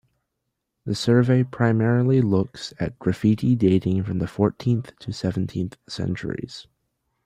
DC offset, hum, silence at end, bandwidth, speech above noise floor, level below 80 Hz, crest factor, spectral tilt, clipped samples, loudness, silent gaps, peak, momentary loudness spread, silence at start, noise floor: under 0.1%; none; 0.65 s; 10.5 kHz; 58 dB; -54 dBFS; 18 dB; -7.5 dB/octave; under 0.1%; -23 LUFS; none; -4 dBFS; 12 LU; 0.85 s; -79 dBFS